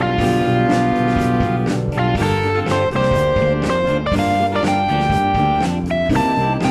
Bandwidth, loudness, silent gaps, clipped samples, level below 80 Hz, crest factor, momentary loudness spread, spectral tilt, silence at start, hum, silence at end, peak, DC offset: 13.5 kHz; -17 LUFS; none; under 0.1%; -32 dBFS; 14 dB; 3 LU; -6.5 dB/octave; 0 s; none; 0 s; -4 dBFS; under 0.1%